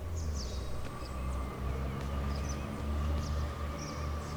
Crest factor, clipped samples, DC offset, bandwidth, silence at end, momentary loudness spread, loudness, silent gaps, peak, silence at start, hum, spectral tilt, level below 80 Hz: 14 dB; under 0.1%; under 0.1%; over 20 kHz; 0 s; 5 LU; -38 LUFS; none; -22 dBFS; 0 s; none; -6 dB/octave; -38 dBFS